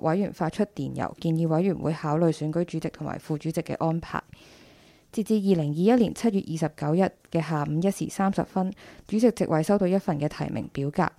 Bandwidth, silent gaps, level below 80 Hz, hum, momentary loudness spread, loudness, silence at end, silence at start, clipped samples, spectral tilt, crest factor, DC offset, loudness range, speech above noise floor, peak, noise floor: 15 kHz; none; -56 dBFS; none; 9 LU; -26 LUFS; 0.1 s; 0.05 s; under 0.1%; -7.5 dB/octave; 18 dB; under 0.1%; 4 LU; 29 dB; -8 dBFS; -55 dBFS